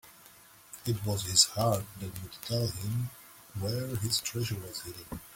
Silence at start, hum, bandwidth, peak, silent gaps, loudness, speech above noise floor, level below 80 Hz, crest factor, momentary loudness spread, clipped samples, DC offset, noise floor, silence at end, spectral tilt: 0.05 s; none; 17 kHz; -8 dBFS; none; -31 LUFS; 24 dB; -58 dBFS; 26 dB; 18 LU; under 0.1%; under 0.1%; -56 dBFS; 0 s; -3.5 dB/octave